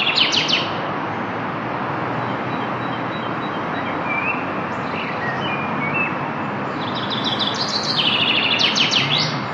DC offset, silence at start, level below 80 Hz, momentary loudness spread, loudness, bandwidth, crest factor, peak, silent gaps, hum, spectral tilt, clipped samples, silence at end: under 0.1%; 0 s; -58 dBFS; 9 LU; -20 LUFS; 11.5 kHz; 18 dB; -4 dBFS; none; none; -3.5 dB/octave; under 0.1%; 0 s